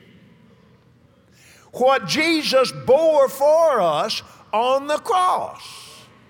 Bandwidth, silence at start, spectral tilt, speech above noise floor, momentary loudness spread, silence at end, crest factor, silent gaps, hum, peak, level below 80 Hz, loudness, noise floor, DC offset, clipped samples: 17.5 kHz; 1.75 s; -3.5 dB/octave; 36 dB; 15 LU; 0.35 s; 16 dB; none; none; -4 dBFS; -64 dBFS; -18 LUFS; -54 dBFS; under 0.1%; under 0.1%